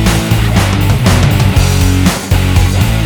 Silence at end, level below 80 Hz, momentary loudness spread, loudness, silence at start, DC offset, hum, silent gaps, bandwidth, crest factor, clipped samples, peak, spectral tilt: 0 s; -16 dBFS; 2 LU; -10 LUFS; 0 s; 0.5%; none; none; over 20 kHz; 10 dB; 0.3%; 0 dBFS; -5.5 dB/octave